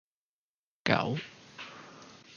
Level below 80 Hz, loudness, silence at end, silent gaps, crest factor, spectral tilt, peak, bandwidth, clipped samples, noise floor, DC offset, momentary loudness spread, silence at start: -68 dBFS; -31 LUFS; 0 s; none; 30 dB; -5.5 dB/octave; -6 dBFS; 7.2 kHz; under 0.1%; under -90 dBFS; under 0.1%; 21 LU; 0.85 s